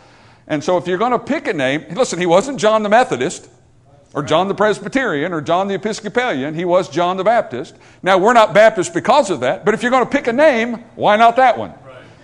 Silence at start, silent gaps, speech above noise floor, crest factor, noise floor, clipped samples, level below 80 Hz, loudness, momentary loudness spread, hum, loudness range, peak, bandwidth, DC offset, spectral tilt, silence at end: 0.5 s; none; 33 dB; 16 dB; -49 dBFS; under 0.1%; -54 dBFS; -15 LUFS; 12 LU; none; 4 LU; 0 dBFS; 12 kHz; under 0.1%; -4.5 dB/octave; 0.2 s